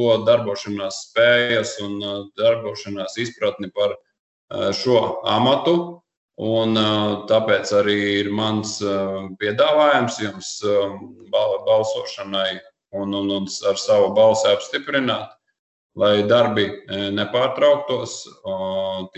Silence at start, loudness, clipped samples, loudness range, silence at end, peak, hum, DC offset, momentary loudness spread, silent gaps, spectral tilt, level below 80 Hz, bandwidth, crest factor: 0 s; -20 LUFS; under 0.1%; 3 LU; 0.1 s; -4 dBFS; none; under 0.1%; 12 LU; 4.19-4.48 s, 6.17-6.29 s, 15.59-15.90 s; -4.5 dB/octave; -58 dBFS; 8.4 kHz; 16 dB